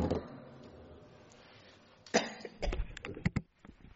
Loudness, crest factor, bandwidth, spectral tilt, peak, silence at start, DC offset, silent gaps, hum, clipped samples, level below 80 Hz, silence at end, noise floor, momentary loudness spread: -38 LUFS; 28 dB; 8 kHz; -4.5 dB/octave; -12 dBFS; 0 s; under 0.1%; none; none; under 0.1%; -46 dBFS; 0.05 s; -60 dBFS; 24 LU